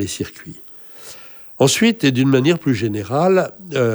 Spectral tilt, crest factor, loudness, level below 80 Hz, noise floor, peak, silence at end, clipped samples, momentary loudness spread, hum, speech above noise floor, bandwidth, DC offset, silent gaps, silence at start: -5 dB/octave; 16 dB; -17 LUFS; -56 dBFS; -38 dBFS; -2 dBFS; 0 s; under 0.1%; 21 LU; none; 21 dB; over 20 kHz; under 0.1%; none; 0 s